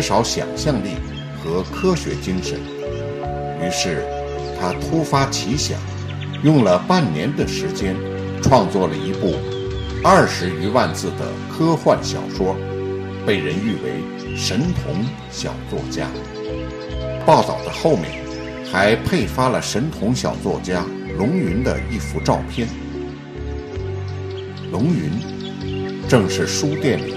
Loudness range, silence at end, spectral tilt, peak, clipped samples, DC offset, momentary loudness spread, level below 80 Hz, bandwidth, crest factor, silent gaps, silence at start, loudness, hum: 6 LU; 0 s; -5.5 dB/octave; 0 dBFS; under 0.1%; under 0.1%; 12 LU; -38 dBFS; 14.5 kHz; 20 dB; none; 0 s; -20 LUFS; none